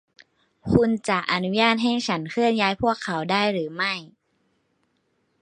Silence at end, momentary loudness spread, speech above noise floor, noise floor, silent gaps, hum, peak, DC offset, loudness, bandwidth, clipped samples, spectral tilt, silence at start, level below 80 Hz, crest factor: 1.35 s; 6 LU; 47 dB; -70 dBFS; none; none; -2 dBFS; under 0.1%; -23 LUFS; 10.5 kHz; under 0.1%; -5 dB/octave; 0.65 s; -50 dBFS; 22 dB